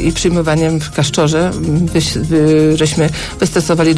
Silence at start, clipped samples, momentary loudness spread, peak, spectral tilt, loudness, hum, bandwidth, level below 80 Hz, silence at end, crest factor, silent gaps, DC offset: 0 s; under 0.1%; 5 LU; -2 dBFS; -5.5 dB/octave; -13 LUFS; none; 11 kHz; -30 dBFS; 0 s; 10 dB; none; under 0.1%